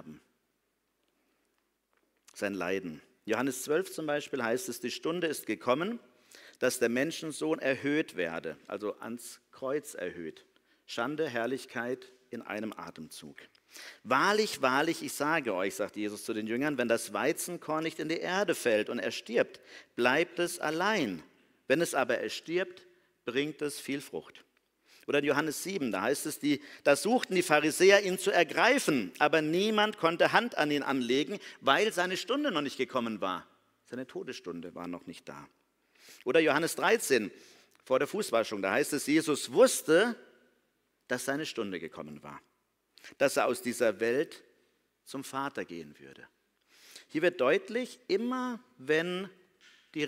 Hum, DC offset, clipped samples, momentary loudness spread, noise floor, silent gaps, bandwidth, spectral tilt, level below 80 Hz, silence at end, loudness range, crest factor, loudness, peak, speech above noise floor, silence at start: none; under 0.1%; under 0.1%; 17 LU; -79 dBFS; none; 16 kHz; -3.5 dB/octave; -78 dBFS; 0 s; 10 LU; 24 dB; -30 LUFS; -8 dBFS; 48 dB; 0.05 s